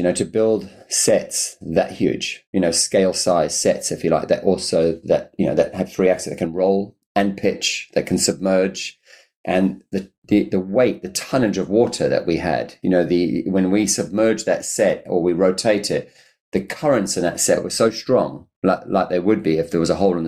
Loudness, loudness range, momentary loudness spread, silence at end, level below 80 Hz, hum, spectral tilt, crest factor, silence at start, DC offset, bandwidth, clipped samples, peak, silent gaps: -19 LUFS; 2 LU; 6 LU; 0 s; -52 dBFS; none; -4 dB/octave; 14 dB; 0 s; under 0.1%; 15.5 kHz; under 0.1%; -4 dBFS; 2.47-2.53 s, 7.06-7.15 s, 9.36-9.44 s, 10.18-10.22 s, 16.40-16.52 s, 18.56-18.62 s